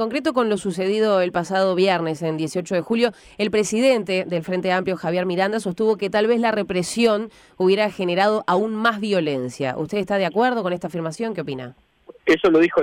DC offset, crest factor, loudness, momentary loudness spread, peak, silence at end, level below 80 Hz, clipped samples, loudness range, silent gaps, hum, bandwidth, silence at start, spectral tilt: under 0.1%; 14 dB; -21 LUFS; 8 LU; -6 dBFS; 0 s; -58 dBFS; under 0.1%; 2 LU; none; none; 16 kHz; 0 s; -5 dB/octave